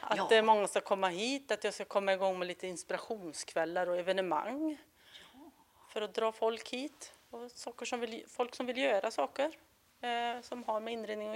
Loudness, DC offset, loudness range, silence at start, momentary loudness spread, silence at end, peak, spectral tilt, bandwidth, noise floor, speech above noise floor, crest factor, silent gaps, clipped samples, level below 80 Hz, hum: -35 LUFS; under 0.1%; 6 LU; 0 s; 15 LU; 0 s; -14 dBFS; -3 dB/octave; 16 kHz; -60 dBFS; 25 dB; 20 dB; none; under 0.1%; -80 dBFS; none